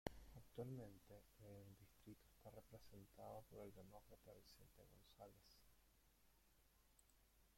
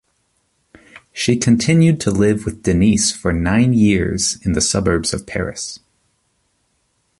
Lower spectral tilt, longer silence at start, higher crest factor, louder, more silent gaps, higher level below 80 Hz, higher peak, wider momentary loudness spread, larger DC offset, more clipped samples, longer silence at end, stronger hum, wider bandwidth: about the same, -6 dB/octave vs -5 dB/octave; second, 0.05 s vs 1.15 s; first, 34 dB vs 16 dB; second, -62 LUFS vs -16 LUFS; neither; second, -74 dBFS vs -36 dBFS; second, -28 dBFS vs 0 dBFS; about the same, 11 LU vs 11 LU; neither; neither; second, 0 s vs 1.45 s; neither; first, 16.5 kHz vs 11.5 kHz